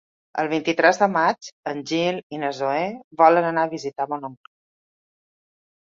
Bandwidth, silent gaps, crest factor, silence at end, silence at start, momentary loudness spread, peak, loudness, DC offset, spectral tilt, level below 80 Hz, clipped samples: 7.6 kHz; 1.52-1.63 s, 2.23-2.30 s, 3.04-3.11 s; 22 dB; 1.5 s; 0.35 s; 14 LU; -2 dBFS; -22 LUFS; under 0.1%; -5 dB/octave; -70 dBFS; under 0.1%